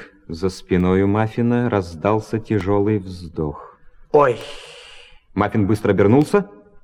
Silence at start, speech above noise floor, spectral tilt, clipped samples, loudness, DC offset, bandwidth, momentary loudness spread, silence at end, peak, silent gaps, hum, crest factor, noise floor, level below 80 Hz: 0 s; 25 dB; -8 dB/octave; under 0.1%; -19 LUFS; under 0.1%; 12.5 kHz; 19 LU; 0.35 s; -2 dBFS; none; none; 18 dB; -43 dBFS; -44 dBFS